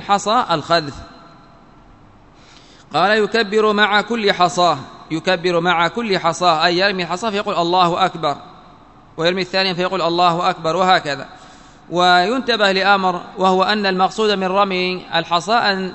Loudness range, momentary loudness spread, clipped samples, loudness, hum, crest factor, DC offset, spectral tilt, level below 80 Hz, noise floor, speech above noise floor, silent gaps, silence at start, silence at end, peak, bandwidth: 3 LU; 8 LU; under 0.1%; -16 LUFS; none; 18 dB; 0.2%; -4 dB/octave; -54 dBFS; -46 dBFS; 30 dB; none; 0 s; 0 s; 0 dBFS; 8.4 kHz